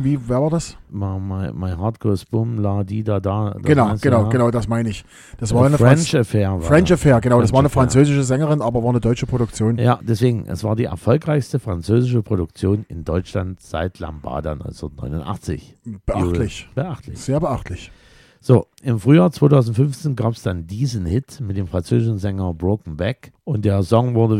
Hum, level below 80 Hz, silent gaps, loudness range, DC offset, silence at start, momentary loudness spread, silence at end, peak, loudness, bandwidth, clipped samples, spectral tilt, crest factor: none; -38 dBFS; none; 9 LU; under 0.1%; 0 s; 13 LU; 0 s; 0 dBFS; -19 LUFS; 13 kHz; under 0.1%; -7.5 dB/octave; 18 dB